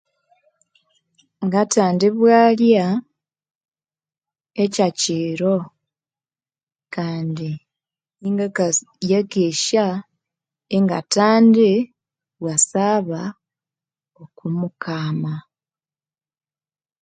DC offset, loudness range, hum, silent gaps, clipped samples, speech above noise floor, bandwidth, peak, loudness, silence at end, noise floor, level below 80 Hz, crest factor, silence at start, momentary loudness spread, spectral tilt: under 0.1%; 9 LU; none; 3.55-3.61 s, 6.63-6.67 s; under 0.1%; over 72 dB; 9.6 kHz; 0 dBFS; -18 LUFS; 1.6 s; under -90 dBFS; -68 dBFS; 20 dB; 1.4 s; 17 LU; -5 dB/octave